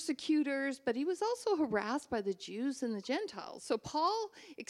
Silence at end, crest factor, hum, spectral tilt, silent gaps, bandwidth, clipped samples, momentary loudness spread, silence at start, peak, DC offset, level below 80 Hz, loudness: 0.05 s; 16 dB; none; -4 dB/octave; none; 13 kHz; under 0.1%; 6 LU; 0 s; -20 dBFS; under 0.1%; -72 dBFS; -36 LUFS